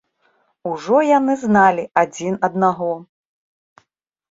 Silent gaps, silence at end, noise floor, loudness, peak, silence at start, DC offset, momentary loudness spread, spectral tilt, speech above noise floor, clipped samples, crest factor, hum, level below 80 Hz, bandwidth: none; 1.3 s; -69 dBFS; -17 LUFS; 0 dBFS; 0.65 s; under 0.1%; 13 LU; -6 dB/octave; 52 dB; under 0.1%; 18 dB; none; -62 dBFS; 7.8 kHz